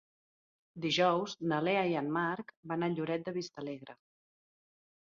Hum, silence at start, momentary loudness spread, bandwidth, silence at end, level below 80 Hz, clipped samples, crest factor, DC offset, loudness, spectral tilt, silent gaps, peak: none; 0.75 s; 13 LU; 7.4 kHz; 1.1 s; -78 dBFS; under 0.1%; 18 dB; under 0.1%; -34 LUFS; -3.5 dB/octave; 2.57-2.63 s; -16 dBFS